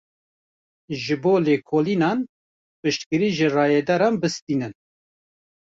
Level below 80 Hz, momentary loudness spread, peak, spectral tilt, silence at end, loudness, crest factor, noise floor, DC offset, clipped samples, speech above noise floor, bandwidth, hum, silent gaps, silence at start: -64 dBFS; 10 LU; -8 dBFS; -6 dB/octave; 1.05 s; -22 LUFS; 16 dB; under -90 dBFS; under 0.1%; under 0.1%; over 69 dB; 7.8 kHz; none; 2.29-2.83 s, 3.06-3.11 s, 4.42-4.47 s; 0.9 s